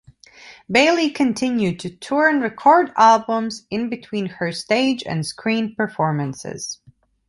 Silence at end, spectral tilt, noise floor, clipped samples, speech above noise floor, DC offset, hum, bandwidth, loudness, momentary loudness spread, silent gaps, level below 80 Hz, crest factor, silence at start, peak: 0.55 s; -4.5 dB/octave; -45 dBFS; under 0.1%; 26 dB; under 0.1%; none; 11.5 kHz; -19 LUFS; 13 LU; none; -60 dBFS; 18 dB; 0.4 s; -2 dBFS